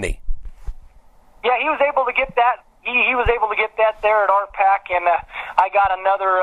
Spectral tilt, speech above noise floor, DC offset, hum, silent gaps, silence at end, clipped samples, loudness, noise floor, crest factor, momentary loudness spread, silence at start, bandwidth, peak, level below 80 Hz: -4.5 dB/octave; 30 dB; under 0.1%; none; none; 0 s; under 0.1%; -18 LUFS; -48 dBFS; 18 dB; 9 LU; 0 s; 11.5 kHz; 0 dBFS; -34 dBFS